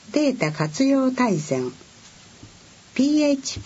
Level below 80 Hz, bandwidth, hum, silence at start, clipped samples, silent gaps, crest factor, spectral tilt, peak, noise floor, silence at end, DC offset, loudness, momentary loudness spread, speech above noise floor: -56 dBFS; 8 kHz; none; 0.1 s; under 0.1%; none; 16 dB; -5 dB/octave; -6 dBFS; -48 dBFS; 0 s; under 0.1%; -22 LUFS; 8 LU; 27 dB